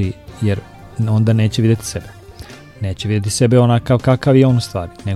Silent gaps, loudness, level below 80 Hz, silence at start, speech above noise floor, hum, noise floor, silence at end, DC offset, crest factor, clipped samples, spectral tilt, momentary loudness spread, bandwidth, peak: none; -16 LUFS; -42 dBFS; 0 s; 22 dB; none; -36 dBFS; 0 s; under 0.1%; 16 dB; under 0.1%; -6.5 dB/octave; 16 LU; 13 kHz; 0 dBFS